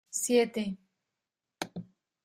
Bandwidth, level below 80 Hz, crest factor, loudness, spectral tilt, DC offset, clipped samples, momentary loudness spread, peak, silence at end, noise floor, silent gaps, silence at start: 16 kHz; -72 dBFS; 20 dB; -30 LUFS; -3.5 dB/octave; under 0.1%; under 0.1%; 19 LU; -14 dBFS; 0.4 s; -89 dBFS; none; 0.15 s